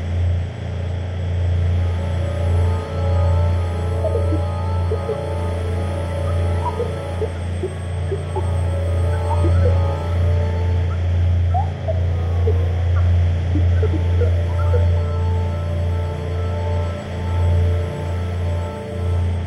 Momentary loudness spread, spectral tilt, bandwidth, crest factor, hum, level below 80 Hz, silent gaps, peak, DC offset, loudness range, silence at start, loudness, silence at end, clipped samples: 7 LU; -8 dB/octave; 8.8 kHz; 12 dB; none; -28 dBFS; none; -6 dBFS; under 0.1%; 4 LU; 0 s; -20 LUFS; 0 s; under 0.1%